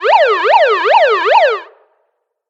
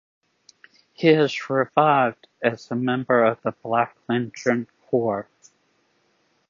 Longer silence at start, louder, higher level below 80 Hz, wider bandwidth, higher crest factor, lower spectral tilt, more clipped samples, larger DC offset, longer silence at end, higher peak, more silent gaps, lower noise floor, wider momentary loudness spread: second, 0 s vs 1 s; first, -10 LUFS vs -22 LUFS; about the same, -68 dBFS vs -70 dBFS; about the same, 8 kHz vs 7.4 kHz; second, 12 dB vs 20 dB; second, -0.5 dB/octave vs -6.5 dB/octave; neither; neither; second, 0.85 s vs 1.25 s; first, 0 dBFS vs -4 dBFS; neither; about the same, -66 dBFS vs -66 dBFS; second, 3 LU vs 8 LU